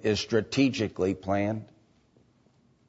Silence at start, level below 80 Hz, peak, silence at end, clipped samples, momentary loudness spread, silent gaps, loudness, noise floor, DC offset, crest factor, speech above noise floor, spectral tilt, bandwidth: 0 s; -60 dBFS; -12 dBFS; 1.25 s; under 0.1%; 6 LU; none; -28 LUFS; -64 dBFS; under 0.1%; 18 dB; 37 dB; -5.5 dB/octave; 8 kHz